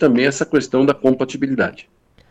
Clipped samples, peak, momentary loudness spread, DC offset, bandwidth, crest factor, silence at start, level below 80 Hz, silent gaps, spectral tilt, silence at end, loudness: under 0.1%; -2 dBFS; 6 LU; under 0.1%; 9 kHz; 14 dB; 0 s; -56 dBFS; none; -5.5 dB/octave; 0.5 s; -18 LUFS